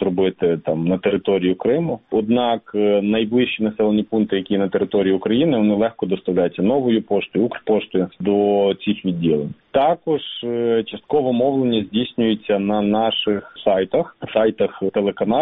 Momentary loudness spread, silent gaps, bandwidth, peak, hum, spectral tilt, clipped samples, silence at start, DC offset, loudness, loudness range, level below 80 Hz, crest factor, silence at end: 5 LU; none; 4 kHz; -2 dBFS; none; -5 dB/octave; under 0.1%; 0 s; under 0.1%; -19 LUFS; 1 LU; -54 dBFS; 16 dB; 0 s